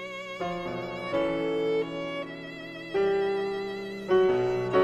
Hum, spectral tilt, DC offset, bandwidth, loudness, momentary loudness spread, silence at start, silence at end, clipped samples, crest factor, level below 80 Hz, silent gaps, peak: none; -6.5 dB/octave; under 0.1%; 8.8 kHz; -29 LUFS; 12 LU; 0 s; 0 s; under 0.1%; 18 dB; -58 dBFS; none; -10 dBFS